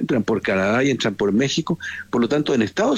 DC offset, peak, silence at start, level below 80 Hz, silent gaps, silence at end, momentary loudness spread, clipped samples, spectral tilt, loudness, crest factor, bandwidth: under 0.1%; -8 dBFS; 0 s; -54 dBFS; none; 0 s; 5 LU; under 0.1%; -5 dB/octave; -20 LUFS; 12 dB; 11.5 kHz